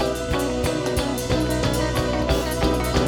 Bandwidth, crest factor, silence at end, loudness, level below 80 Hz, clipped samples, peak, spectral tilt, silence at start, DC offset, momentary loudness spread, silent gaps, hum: 19 kHz; 16 dB; 0 s; -23 LUFS; -30 dBFS; under 0.1%; -6 dBFS; -5 dB/octave; 0 s; under 0.1%; 2 LU; none; none